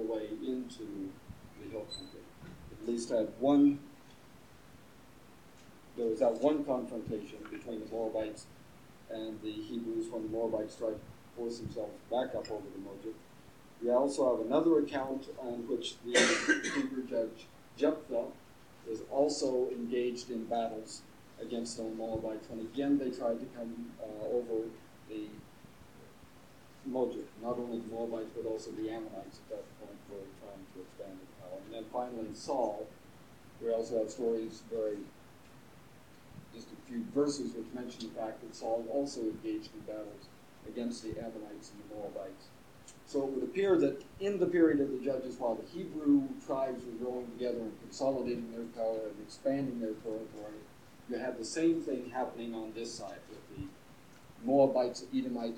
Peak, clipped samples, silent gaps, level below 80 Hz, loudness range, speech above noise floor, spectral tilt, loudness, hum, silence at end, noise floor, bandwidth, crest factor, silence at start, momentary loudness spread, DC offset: -12 dBFS; under 0.1%; none; -68 dBFS; 9 LU; 23 dB; -4.5 dB/octave; -35 LUFS; none; 0 s; -58 dBFS; 16.5 kHz; 24 dB; 0 s; 20 LU; under 0.1%